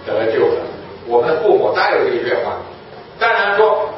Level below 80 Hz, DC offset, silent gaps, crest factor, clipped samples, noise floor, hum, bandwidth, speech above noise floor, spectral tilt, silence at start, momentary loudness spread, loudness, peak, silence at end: -54 dBFS; under 0.1%; none; 16 dB; under 0.1%; -35 dBFS; none; 5.8 kHz; 18 dB; -9 dB/octave; 0 s; 17 LU; -15 LUFS; 0 dBFS; 0 s